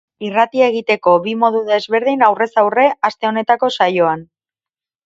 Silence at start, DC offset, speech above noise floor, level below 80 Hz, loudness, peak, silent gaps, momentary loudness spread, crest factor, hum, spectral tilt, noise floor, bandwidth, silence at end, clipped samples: 0.2 s; under 0.1%; over 76 dB; -66 dBFS; -15 LUFS; 0 dBFS; none; 5 LU; 16 dB; none; -5.5 dB/octave; under -90 dBFS; 7.8 kHz; 0.85 s; under 0.1%